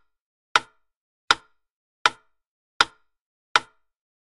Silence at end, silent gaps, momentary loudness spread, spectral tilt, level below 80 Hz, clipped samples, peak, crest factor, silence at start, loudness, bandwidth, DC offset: 0.65 s; 0.97-1.28 s, 1.72-2.05 s, 2.47-2.80 s, 3.21-3.55 s; 1 LU; 0 dB/octave; -64 dBFS; under 0.1%; -2 dBFS; 26 dB; 0.55 s; -24 LUFS; 11.5 kHz; under 0.1%